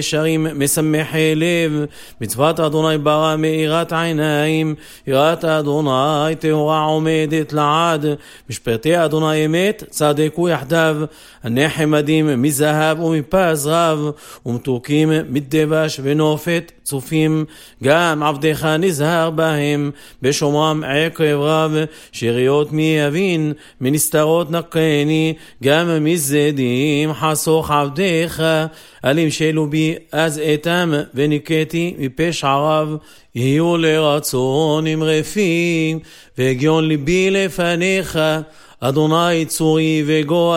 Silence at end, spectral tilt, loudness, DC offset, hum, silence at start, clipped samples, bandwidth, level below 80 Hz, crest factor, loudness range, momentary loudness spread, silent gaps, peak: 0 s; -5 dB/octave; -17 LUFS; under 0.1%; none; 0 s; under 0.1%; 16.5 kHz; -48 dBFS; 16 dB; 1 LU; 7 LU; none; 0 dBFS